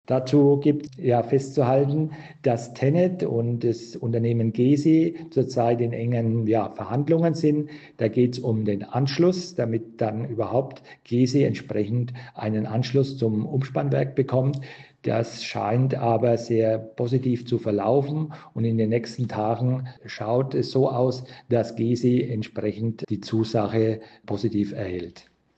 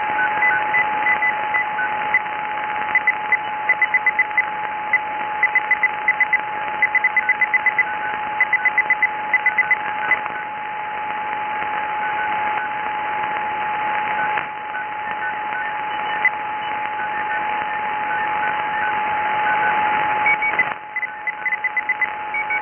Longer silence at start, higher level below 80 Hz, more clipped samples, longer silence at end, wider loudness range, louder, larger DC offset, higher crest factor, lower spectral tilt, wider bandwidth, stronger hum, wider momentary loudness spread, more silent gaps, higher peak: about the same, 0.1 s vs 0 s; about the same, -64 dBFS vs -60 dBFS; neither; first, 0.35 s vs 0 s; second, 3 LU vs 6 LU; second, -24 LUFS vs -19 LUFS; neither; about the same, 14 dB vs 16 dB; first, -8 dB/octave vs -5 dB/octave; first, 8.2 kHz vs 3.4 kHz; neither; about the same, 8 LU vs 8 LU; neither; about the same, -8 dBFS vs -6 dBFS